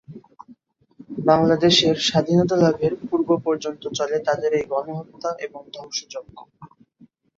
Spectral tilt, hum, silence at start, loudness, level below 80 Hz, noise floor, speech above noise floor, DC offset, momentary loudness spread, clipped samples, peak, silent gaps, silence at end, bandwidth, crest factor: -5 dB/octave; none; 0.1 s; -20 LUFS; -58 dBFS; -55 dBFS; 34 dB; under 0.1%; 17 LU; under 0.1%; -2 dBFS; none; 0.7 s; 7.8 kHz; 20 dB